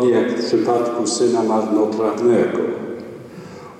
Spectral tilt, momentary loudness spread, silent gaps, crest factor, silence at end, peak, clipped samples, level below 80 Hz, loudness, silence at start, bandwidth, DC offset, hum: -5 dB/octave; 18 LU; none; 12 dB; 0 s; -6 dBFS; under 0.1%; -64 dBFS; -18 LUFS; 0 s; 10.5 kHz; under 0.1%; none